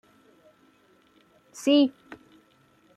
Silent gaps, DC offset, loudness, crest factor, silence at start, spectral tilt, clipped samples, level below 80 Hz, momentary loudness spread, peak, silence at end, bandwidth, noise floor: none; under 0.1%; -23 LUFS; 20 dB; 1.6 s; -3.5 dB/octave; under 0.1%; -78 dBFS; 27 LU; -10 dBFS; 0.8 s; 12.5 kHz; -62 dBFS